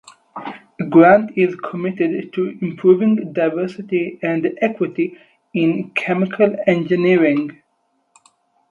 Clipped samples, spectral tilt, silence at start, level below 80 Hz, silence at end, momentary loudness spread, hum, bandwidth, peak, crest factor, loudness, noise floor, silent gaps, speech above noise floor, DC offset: under 0.1%; -8.5 dB/octave; 0.35 s; -64 dBFS; 1.2 s; 13 LU; none; 7.8 kHz; 0 dBFS; 18 dB; -17 LUFS; -66 dBFS; none; 50 dB; under 0.1%